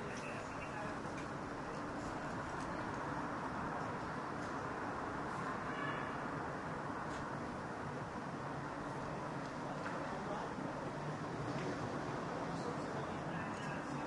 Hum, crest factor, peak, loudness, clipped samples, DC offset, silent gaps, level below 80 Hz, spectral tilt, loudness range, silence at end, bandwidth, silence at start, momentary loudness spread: none; 14 dB; -28 dBFS; -43 LUFS; under 0.1%; under 0.1%; none; -64 dBFS; -6 dB/octave; 2 LU; 0 s; 11.5 kHz; 0 s; 3 LU